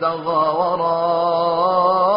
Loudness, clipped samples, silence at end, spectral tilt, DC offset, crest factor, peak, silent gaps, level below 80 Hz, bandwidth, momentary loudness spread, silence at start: -18 LUFS; under 0.1%; 0 s; -4 dB/octave; under 0.1%; 12 dB; -6 dBFS; none; -62 dBFS; 5.4 kHz; 3 LU; 0 s